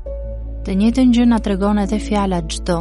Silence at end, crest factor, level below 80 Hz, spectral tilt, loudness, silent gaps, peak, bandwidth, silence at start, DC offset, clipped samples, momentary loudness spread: 0 s; 12 dB; -26 dBFS; -6.5 dB/octave; -17 LUFS; none; -4 dBFS; 11.5 kHz; 0 s; under 0.1%; under 0.1%; 15 LU